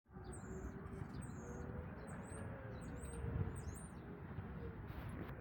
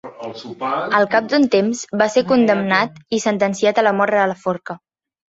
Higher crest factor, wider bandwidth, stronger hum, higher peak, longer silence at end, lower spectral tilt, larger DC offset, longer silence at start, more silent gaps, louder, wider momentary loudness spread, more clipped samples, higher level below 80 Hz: about the same, 20 dB vs 16 dB; first, 17 kHz vs 8 kHz; neither; second, -28 dBFS vs -2 dBFS; second, 0 s vs 0.6 s; first, -7 dB/octave vs -4.5 dB/octave; neither; about the same, 0.05 s vs 0.05 s; neither; second, -50 LUFS vs -17 LUFS; second, 6 LU vs 13 LU; neither; first, -56 dBFS vs -62 dBFS